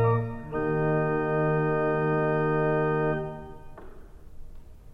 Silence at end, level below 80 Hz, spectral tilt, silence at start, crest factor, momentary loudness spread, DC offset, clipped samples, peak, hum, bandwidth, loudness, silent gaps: 0 s; -46 dBFS; -10 dB/octave; 0 s; 14 dB; 10 LU; under 0.1%; under 0.1%; -12 dBFS; none; 4.9 kHz; -26 LUFS; none